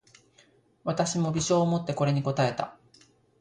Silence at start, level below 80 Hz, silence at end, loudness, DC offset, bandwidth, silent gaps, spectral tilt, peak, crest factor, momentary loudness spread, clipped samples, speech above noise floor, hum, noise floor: 0.85 s; -60 dBFS; 0.7 s; -27 LUFS; under 0.1%; 10.5 kHz; none; -5.5 dB/octave; -12 dBFS; 18 dB; 10 LU; under 0.1%; 36 dB; none; -62 dBFS